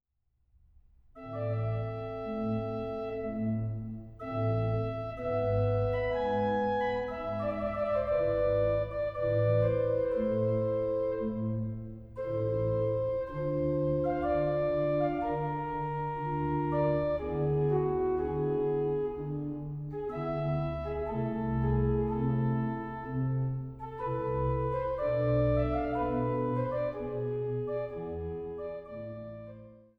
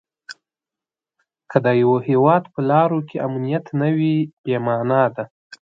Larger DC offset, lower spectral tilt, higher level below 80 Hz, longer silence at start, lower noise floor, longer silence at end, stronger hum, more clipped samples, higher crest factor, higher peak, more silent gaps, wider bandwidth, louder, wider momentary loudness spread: neither; first, -10.5 dB/octave vs -9 dB/octave; first, -46 dBFS vs -64 dBFS; first, 1.15 s vs 0.3 s; second, -75 dBFS vs -89 dBFS; about the same, 0.2 s vs 0.25 s; neither; neither; second, 14 dB vs 20 dB; second, -16 dBFS vs 0 dBFS; second, none vs 4.33-4.44 s, 5.31-5.50 s; second, 5.6 kHz vs 7.6 kHz; second, -32 LUFS vs -19 LUFS; second, 9 LU vs 14 LU